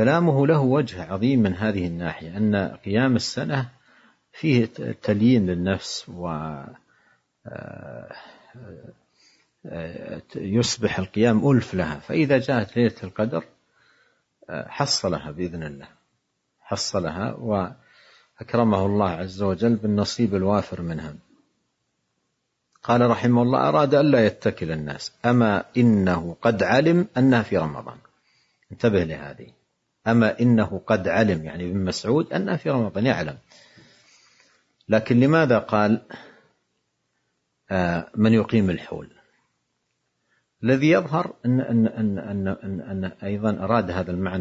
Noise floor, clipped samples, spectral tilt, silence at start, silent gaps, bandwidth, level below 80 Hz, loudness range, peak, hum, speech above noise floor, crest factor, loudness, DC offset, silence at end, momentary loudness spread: -75 dBFS; under 0.1%; -6.5 dB/octave; 0 s; none; 8 kHz; -58 dBFS; 8 LU; -4 dBFS; none; 53 dB; 20 dB; -22 LUFS; under 0.1%; 0 s; 16 LU